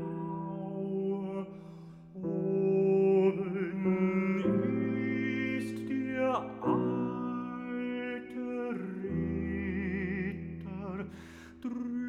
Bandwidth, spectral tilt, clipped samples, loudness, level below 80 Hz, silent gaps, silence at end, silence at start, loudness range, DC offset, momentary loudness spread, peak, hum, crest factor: 10.5 kHz; -9 dB/octave; under 0.1%; -33 LUFS; -58 dBFS; none; 0 s; 0 s; 7 LU; under 0.1%; 13 LU; -16 dBFS; none; 16 dB